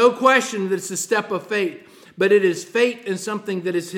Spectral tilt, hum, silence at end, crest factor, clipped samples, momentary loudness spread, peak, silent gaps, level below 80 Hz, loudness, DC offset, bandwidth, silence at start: -4 dB/octave; none; 0 s; 18 dB; under 0.1%; 10 LU; -2 dBFS; none; -76 dBFS; -20 LUFS; under 0.1%; 16.5 kHz; 0 s